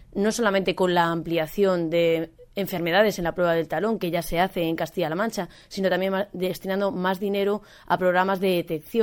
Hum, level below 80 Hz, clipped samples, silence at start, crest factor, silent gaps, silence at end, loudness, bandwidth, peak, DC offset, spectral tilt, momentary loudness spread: none; -50 dBFS; under 0.1%; 0 s; 18 dB; none; 0 s; -24 LUFS; 18 kHz; -6 dBFS; under 0.1%; -5.5 dB/octave; 7 LU